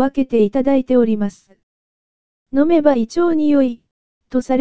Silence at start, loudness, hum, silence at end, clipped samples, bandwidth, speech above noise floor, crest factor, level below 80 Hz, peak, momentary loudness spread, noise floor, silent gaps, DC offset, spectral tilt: 0 s; -16 LUFS; none; 0 s; under 0.1%; 8 kHz; over 75 dB; 16 dB; -50 dBFS; 0 dBFS; 9 LU; under -90 dBFS; 1.63-2.46 s, 3.91-4.21 s; 2%; -7 dB/octave